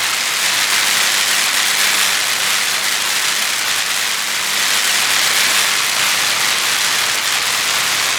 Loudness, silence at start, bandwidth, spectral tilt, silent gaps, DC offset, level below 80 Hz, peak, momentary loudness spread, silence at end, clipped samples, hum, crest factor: -13 LUFS; 0 s; over 20 kHz; 2 dB/octave; none; under 0.1%; -60 dBFS; -2 dBFS; 3 LU; 0 s; under 0.1%; none; 14 dB